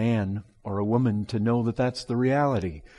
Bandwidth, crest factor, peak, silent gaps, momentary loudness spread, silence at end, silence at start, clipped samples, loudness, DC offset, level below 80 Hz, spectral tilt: 11.5 kHz; 14 dB; -12 dBFS; none; 8 LU; 0.15 s; 0 s; under 0.1%; -26 LUFS; under 0.1%; -54 dBFS; -8 dB/octave